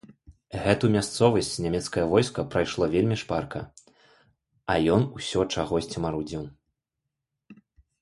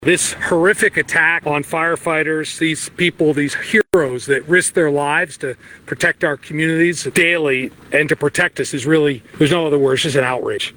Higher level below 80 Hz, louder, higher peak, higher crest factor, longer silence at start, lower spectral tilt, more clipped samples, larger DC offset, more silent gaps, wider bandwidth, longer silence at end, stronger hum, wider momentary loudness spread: about the same, -48 dBFS vs -52 dBFS; second, -26 LUFS vs -16 LUFS; second, -6 dBFS vs -2 dBFS; first, 22 dB vs 14 dB; first, 0.3 s vs 0 s; first, -5.5 dB/octave vs -4 dB/octave; neither; neither; neither; second, 11.5 kHz vs over 20 kHz; first, 0.5 s vs 0.05 s; neither; first, 14 LU vs 6 LU